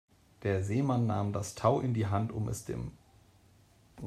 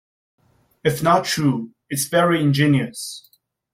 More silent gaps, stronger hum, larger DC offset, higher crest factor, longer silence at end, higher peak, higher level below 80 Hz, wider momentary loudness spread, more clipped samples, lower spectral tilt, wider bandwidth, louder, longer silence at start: neither; neither; neither; about the same, 22 dB vs 18 dB; second, 0 s vs 0.55 s; second, -12 dBFS vs -4 dBFS; about the same, -58 dBFS vs -58 dBFS; about the same, 10 LU vs 12 LU; neither; first, -7 dB/octave vs -5 dB/octave; second, 14.5 kHz vs 16.5 kHz; second, -32 LUFS vs -19 LUFS; second, 0.4 s vs 0.85 s